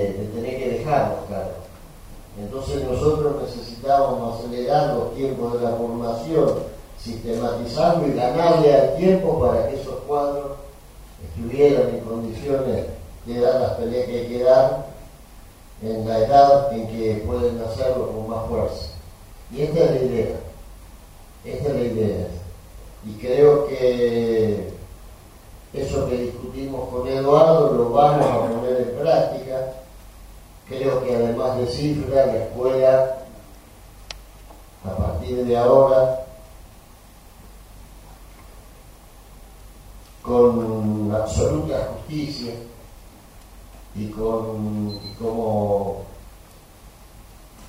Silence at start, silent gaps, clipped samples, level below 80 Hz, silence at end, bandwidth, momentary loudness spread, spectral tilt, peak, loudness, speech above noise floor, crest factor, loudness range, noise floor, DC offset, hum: 0 s; none; under 0.1%; -40 dBFS; 0 s; 16 kHz; 19 LU; -7 dB/octave; -2 dBFS; -21 LUFS; 26 dB; 20 dB; 7 LU; -46 dBFS; under 0.1%; none